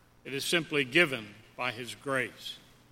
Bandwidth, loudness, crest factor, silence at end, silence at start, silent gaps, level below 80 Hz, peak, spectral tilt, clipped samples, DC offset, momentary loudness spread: 16.5 kHz; -30 LUFS; 24 dB; 0.35 s; 0.25 s; none; -68 dBFS; -8 dBFS; -3.5 dB/octave; under 0.1%; under 0.1%; 17 LU